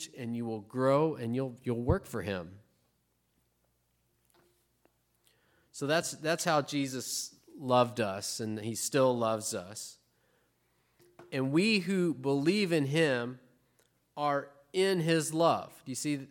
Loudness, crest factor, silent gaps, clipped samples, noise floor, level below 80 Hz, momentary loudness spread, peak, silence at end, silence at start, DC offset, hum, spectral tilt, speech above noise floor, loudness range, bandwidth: -31 LUFS; 20 dB; none; under 0.1%; -76 dBFS; -58 dBFS; 12 LU; -12 dBFS; 0.05 s; 0 s; under 0.1%; none; -4.5 dB/octave; 45 dB; 8 LU; 17.5 kHz